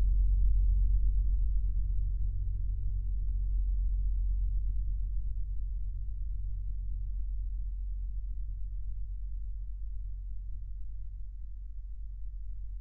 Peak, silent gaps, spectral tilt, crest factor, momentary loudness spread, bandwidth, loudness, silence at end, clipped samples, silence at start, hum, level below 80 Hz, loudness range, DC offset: -18 dBFS; none; -13.5 dB/octave; 14 dB; 14 LU; 0.4 kHz; -37 LUFS; 0 s; under 0.1%; 0 s; none; -32 dBFS; 10 LU; under 0.1%